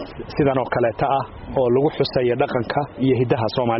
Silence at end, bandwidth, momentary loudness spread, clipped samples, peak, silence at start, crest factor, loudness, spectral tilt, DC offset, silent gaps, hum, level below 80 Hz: 0 s; 5.8 kHz; 5 LU; under 0.1%; -6 dBFS; 0 s; 14 dB; -21 LUFS; -5.5 dB/octave; under 0.1%; none; none; -44 dBFS